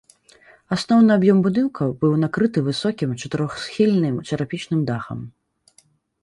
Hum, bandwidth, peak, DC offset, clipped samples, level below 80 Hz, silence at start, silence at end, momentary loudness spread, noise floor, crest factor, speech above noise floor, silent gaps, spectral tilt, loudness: none; 11.5 kHz; -4 dBFS; under 0.1%; under 0.1%; -56 dBFS; 0.7 s; 0.95 s; 11 LU; -59 dBFS; 16 dB; 40 dB; none; -7 dB/octave; -20 LUFS